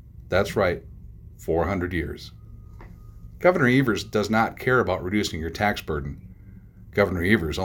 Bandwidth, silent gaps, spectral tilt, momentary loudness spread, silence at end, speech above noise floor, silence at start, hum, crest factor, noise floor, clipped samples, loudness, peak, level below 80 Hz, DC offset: 17 kHz; none; -6 dB/octave; 15 LU; 0 s; 22 dB; 0.05 s; none; 22 dB; -45 dBFS; under 0.1%; -24 LUFS; -4 dBFS; -42 dBFS; under 0.1%